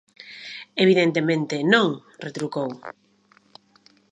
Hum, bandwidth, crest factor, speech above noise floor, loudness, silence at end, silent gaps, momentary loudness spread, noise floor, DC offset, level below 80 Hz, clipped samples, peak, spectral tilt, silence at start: none; 10.5 kHz; 22 dB; 38 dB; -22 LUFS; 1.25 s; none; 21 LU; -59 dBFS; under 0.1%; -74 dBFS; under 0.1%; -2 dBFS; -5.5 dB/octave; 0.25 s